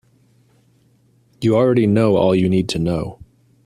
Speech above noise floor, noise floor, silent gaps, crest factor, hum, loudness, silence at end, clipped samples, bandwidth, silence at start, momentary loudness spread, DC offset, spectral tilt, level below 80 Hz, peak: 41 dB; -57 dBFS; none; 16 dB; none; -17 LUFS; 0.5 s; under 0.1%; 13 kHz; 1.4 s; 8 LU; under 0.1%; -7.5 dB/octave; -48 dBFS; -2 dBFS